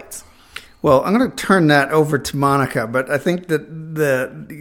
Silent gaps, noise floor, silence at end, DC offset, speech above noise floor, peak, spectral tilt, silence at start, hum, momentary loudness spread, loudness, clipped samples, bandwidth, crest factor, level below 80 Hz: none; -39 dBFS; 0 s; under 0.1%; 22 dB; 0 dBFS; -5.5 dB/octave; 0 s; none; 20 LU; -17 LUFS; under 0.1%; 17.5 kHz; 18 dB; -50 dBFS